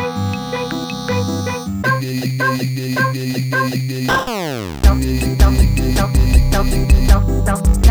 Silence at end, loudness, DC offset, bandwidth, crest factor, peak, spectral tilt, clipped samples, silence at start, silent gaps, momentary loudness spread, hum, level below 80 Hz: 0 s; -17 LUFS; under 0.1%; over 20 kHz; 14 dB; 0 dBFS; -5.5 dB/octave; under 0.1%; 0 s; none; 8 LU; none; -18 dBFS